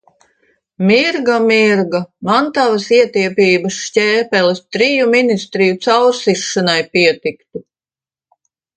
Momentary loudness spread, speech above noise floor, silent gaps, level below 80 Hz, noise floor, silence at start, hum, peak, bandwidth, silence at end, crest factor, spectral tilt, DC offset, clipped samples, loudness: 7 LU; over 77 dB; none; -62 dBFS; under -90 dBFS; 0.8 s; none; 0 dBFS; 9.4 kHz; 1.15 s; 14 dB; -4.5 dB/octave; under 0.1%; under 0.1%; -13 LUFS